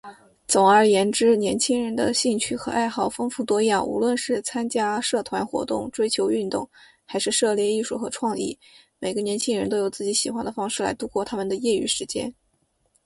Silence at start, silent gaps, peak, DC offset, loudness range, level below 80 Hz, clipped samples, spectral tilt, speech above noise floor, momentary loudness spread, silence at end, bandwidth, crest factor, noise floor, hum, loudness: 0.05 s; none; -4 dBFS; under 0.1%; 5 LU; -60 dBFS; under 0.1%; -3 dB/octave; 46 dB; 10 LU; 0.75 s; 11.5 kHz; 18 dB; -69 dBFS; none; -23 LUFS